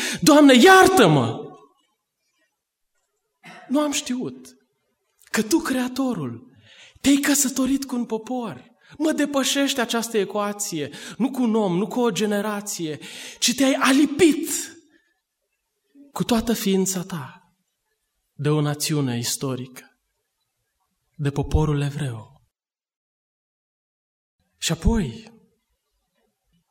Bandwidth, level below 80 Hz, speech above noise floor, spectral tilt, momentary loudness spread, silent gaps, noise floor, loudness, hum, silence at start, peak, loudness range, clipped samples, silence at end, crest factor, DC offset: 16.5 kHz; -40 dBFS; 61 dB; -4 dB/octave; 16 LU; 22.96-24.39 s; -82 dBFS; -20 LUFS; none; 0 s; -2 dBFS; 9 LU; under 0.1%; 1.5 s; 22 dB; under 0.1%